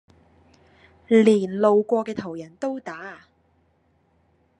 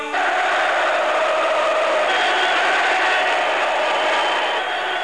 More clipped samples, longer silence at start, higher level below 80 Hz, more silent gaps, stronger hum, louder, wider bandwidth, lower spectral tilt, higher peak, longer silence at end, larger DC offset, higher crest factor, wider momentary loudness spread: neither; first, 1.1 s vs 0 s; second, -72 dBFS vs -62 dBFS; neither; neither; second, -21 LUFS vs -18 LUFS; about the same, 10.5 kHz vs 11 kHz; first, -7 dB/octave vs -0.5 dB/octave; about the same, -4 dBFS vs -6 dBFS; first, 1.45 s vs 0 s; second, under 0.1% vs 0.3%; first, 20 dB vs 12 dB; first, 19 LU vs 3 LU